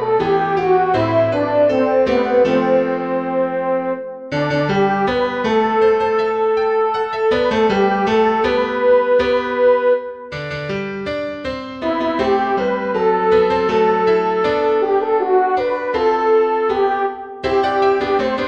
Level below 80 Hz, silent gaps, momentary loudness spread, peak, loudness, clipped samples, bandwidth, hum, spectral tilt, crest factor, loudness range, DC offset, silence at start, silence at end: -46 dBFS; none; 9 LU; -4 dBFS; -17 LUFS; under 0.1%; 7.6 kHz; none; -6.5 dB/octave; 14 dB; 3 LU; 0.2%; 0 s; 0 s